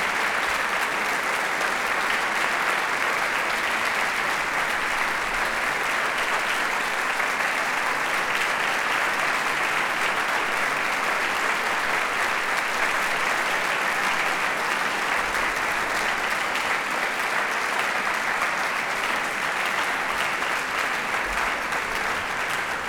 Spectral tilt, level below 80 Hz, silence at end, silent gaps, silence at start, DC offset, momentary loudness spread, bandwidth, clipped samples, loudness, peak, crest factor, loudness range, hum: -1 dB/octave; -52 dBFS; 0 s; none; 0 s; under 0.1%; 2 LU; over 20 kHz; under 0.1%; -23 LUFS; -8 dBFS; 16 dB; 1 LU; none